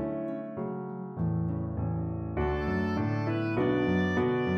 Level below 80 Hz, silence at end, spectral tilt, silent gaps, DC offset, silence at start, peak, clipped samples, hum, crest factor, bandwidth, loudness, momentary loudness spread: -46 dBFS; 0 s; -9 dB/octave; none; under 0.1%; 0 s; -16 dBFS; under 0.1%; none; 14 dB; 6.6 kHz; -31 LUFS; 9 LU